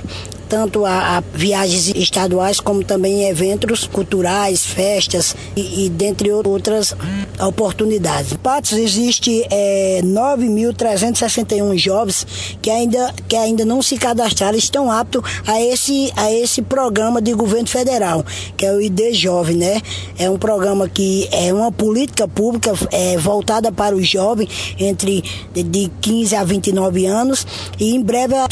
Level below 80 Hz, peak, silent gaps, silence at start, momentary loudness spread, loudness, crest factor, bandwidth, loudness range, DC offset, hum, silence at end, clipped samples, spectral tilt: -42 dBFS; 0 dBFS; none; 0 s; 5 LU; -16 LUFS; 16 dB; 11 kHz; 2 LU; under 0.1%; none; 0 s; under 0.1%; -4 dB/octave